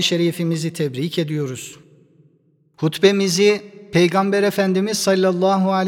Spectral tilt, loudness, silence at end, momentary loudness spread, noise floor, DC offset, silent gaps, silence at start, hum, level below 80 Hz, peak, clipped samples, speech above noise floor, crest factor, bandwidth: -5 dB/octave; -18 LUFS; 0 s; 9 LU; -59 dBFS; under 0.1%; none; 0 s; none; -64 dBFS; 0 dBFS; under 0.1%; 41 dB; 18 dB; 17.5 kHz